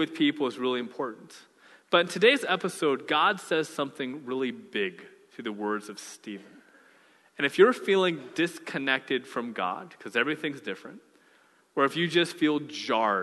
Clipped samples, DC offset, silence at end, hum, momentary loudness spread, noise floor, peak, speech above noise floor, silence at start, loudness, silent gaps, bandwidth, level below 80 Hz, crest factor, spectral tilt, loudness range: under 0.1%; under 0.1%; 0 s; none; 17 LU; -62 dBFS; -6 dBFS; 35 dB; 0 s; -27 LUFS; none; 12.5 kHz; -82 dBFS; 22 dB; -4.5 dB/octave; 7 LU